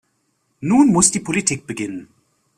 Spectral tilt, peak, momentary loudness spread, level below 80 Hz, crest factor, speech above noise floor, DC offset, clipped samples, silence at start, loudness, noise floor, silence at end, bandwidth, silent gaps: -4 dB/octave; 0 dBFS; 16 LU; -54 dBFS; 20 dB; 50 dB; under 0.1%; under 0.1%; 0.6 s; -17 LUFS; -67 dBFS; 0.55 s; 14 kHz; none